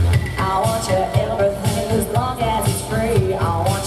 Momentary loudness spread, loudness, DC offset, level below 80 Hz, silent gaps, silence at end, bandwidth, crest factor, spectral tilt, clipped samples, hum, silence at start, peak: 2 LU; -19 LUFS; under 0.1%; -32 dBFS; none; 0 s; 15.5 kHz; 14 dB; -5.5 dB/octave; under 0.1%; none; 0 s; -4 dBFS